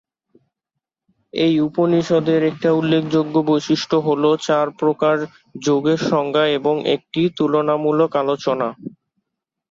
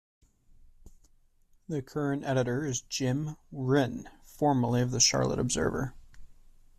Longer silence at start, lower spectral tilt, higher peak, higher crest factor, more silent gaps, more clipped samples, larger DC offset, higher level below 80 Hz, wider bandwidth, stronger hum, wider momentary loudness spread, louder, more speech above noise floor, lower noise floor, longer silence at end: first, 1.35 s vs 0.85 s; first, -6 dB/octave vs -4.5 dB/octave; first, -4 dBFS vs -10 dBFS; second, 14 dB vs 22 dB; neither; neither; neither; second, -62 dBFS vs -54 dBFS; second, 7.6 kHz vs 13.5 kHz; neither; second, 5 LU vs 14 LU; first, -18 LUFS vs -29 LUFS; first, 64 dB vs 35 dB; first, -82 dBFS vs -63 dBFS; first, 0.85 s vs 0.45 s